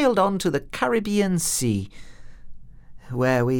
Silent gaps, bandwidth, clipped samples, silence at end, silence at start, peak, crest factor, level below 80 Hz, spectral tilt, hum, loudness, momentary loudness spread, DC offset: none; 18 kHz; under 0.1%; 0 s; 0 s; -6 dBFS; 16 dB; -46 dBFS; -5 dB/octave; none; -23 LUFS; 7 LU; under 0.1%